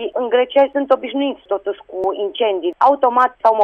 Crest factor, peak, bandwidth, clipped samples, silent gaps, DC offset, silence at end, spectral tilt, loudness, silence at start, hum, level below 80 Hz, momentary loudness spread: 14 dB; -2 dBFS; 6 kHz; under 0.1%; none; under 0.1%; 0 s; -5 dB/octave; -17 LUFS; 0 s; none; -62 dBFS; 9 LU